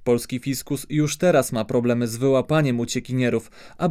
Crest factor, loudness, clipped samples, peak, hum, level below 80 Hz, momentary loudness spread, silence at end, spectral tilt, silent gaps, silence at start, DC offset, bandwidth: 14 dB; -22 LUFS; under 0.1%; -6 dBFS; none; -52 dBFS; 8 LU; 0 s; -5.5 dB/octave; none; 0 s; under 0.1%; 16 kHz